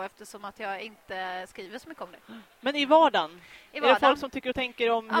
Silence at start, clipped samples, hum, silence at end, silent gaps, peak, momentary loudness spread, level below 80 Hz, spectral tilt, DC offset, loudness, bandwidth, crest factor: 0 s; under 0.1%; none; 0 s; none; -6 dBFS; 21 LU; -64 dBFS; -3.5 dB/octave; under 0.1%; -26 LUFS; 16.5 kHz; 22 dB